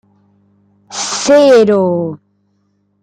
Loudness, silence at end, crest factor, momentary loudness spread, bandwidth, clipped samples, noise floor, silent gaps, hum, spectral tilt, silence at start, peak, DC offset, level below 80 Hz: -11 LUFS; 0.85 s; 12 dB; 18 LU; 10.5 kHz; under 0.1%; -60 dBFS; none; 50 Hz at -35 dBFS; -4.5 dB/octave; 0.9 s; -2 dBFS; under 0.1%; -58 dBFS